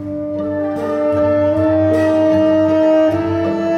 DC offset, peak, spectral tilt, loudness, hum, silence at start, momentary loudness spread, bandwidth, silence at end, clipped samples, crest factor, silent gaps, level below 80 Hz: under 0.1%; -4 dBFS; -8 dB/octave; -15 LUFS; none; 0 s; 7 LU; 8.8 kHz; 0 s; under 0.1%; 10 dB; none; -50 dBFS